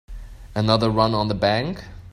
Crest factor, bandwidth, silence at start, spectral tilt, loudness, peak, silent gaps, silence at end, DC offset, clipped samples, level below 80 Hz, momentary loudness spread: 20 dB; 11.5 kHz; 0.1 s; -6.5 dB/octave; -21 LUFS; -2 dBFS; none; 0 s; under 0.1%; under 0.1%; -40 dBFS; 15 LU